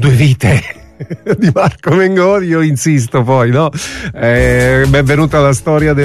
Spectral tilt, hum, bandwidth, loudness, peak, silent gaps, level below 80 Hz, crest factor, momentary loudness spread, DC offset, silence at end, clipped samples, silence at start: -6.5 dB/octave; none; 13.5 kHz; -11 LUFS; 0 dBFS; none; -28 dBFS; 10 dB; 9 LU; under 0.1%; 0 s; under 0.1%; 0 s